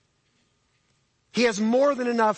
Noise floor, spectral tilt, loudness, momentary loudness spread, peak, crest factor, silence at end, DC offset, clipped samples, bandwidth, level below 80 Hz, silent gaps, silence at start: -69 dBFS; -4.5 dB/octave; -23 LUFS; 3 LU; -10 dBFS; 16 dB; 0 s; under 0.1%; under 0.1%; 8.8 kHz; -70 dBFS; none; 1.35 s